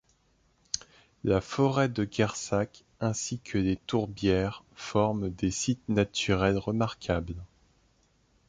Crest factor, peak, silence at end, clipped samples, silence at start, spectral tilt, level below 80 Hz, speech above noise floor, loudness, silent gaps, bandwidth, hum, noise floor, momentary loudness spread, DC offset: 20 dB; -10 dBFS; 1.05 s; under 0.1%; 0.75 s; -5 dB/octave; -48 dBFS; 39 dB; -29 LUFS; none; 9.6 kHz; none; -68 dBFS; 10 LU; under 0.1%